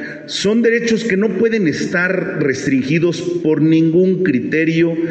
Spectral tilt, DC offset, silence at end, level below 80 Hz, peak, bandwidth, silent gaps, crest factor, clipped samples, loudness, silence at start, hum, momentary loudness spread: -6 dB/octave; under 0.1%; 0 s; -56 dBFS; -2 dBFS; 8.6 kHz; none; 12 dB; under 0.1%; -15 LUFS; 0 s; none; 5 LU